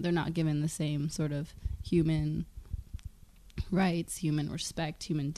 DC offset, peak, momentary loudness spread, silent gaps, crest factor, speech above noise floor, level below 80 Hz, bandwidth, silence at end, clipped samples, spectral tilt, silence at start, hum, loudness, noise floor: under 0.1%; -16 dBFS; 15 LU; none; 16 dB; 23 dB; -46 dBFS; 13.5 kHz; 0 s; under 0.1%; -6 dB/octave; 0 s; none; -33 LUFS; -54 dBFS